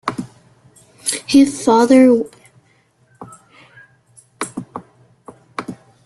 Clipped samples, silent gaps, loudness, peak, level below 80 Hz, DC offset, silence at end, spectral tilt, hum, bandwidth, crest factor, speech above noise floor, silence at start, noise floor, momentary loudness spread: under 0.1%; none; -14 LUFS; -2 dBFS; -58 dBFS; under 0.1%; 0.3 s; -4 dB/octave; none; 12.5 kHz; 18 dB; 46 dB; 0.05 s; -57 dBFS; 24 LU